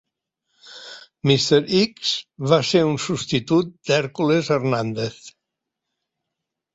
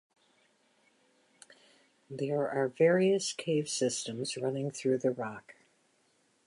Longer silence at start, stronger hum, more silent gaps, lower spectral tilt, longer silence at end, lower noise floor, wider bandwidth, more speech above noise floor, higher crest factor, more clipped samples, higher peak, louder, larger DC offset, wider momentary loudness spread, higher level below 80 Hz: second, 0.65 s vs 2.1 s; neither; neither; about the same, -5 dB/octave vs -4.5 dB/octave; first, 1.45 s vs 1.05 s; first, -82 dBFS vs -71 dBFS; second, 8 kHz vs 11.5 kHz; first, 62 dB vs 41 dB; about the same, 20 dB vs 20 dB; neither; first, -2 dBFS vs -14 dBFS; first, -20 LUFS vs -31 LUFS; neither; about the same, 12 LU vs 12 LU; first, -60 dBFS vs -82 dBFS